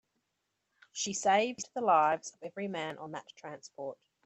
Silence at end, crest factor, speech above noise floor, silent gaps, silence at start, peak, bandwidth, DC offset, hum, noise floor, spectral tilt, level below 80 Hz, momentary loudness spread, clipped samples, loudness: 0.3 s; 20 dB; 50 dB; none; 0.95 s; -14 dBFS; 8.4 kHz; under 0.1%; none; -83 dBFS; -3 dB/octave; -82 dBFS; 18 LU; under 0.1%; -31 LUFS